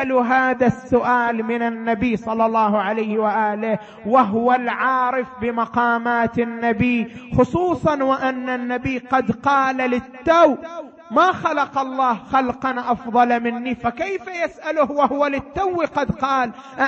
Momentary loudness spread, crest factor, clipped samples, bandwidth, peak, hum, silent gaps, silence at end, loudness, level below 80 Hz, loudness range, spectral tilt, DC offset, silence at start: 7 LU; 16 dB; under 0.1%; 8 kHz; -4 dBFS; none; none; 0 s; -20 LUFS; -48 dBFS; 2 LU; -6.5 dB/octave; under 0.1%; 0 s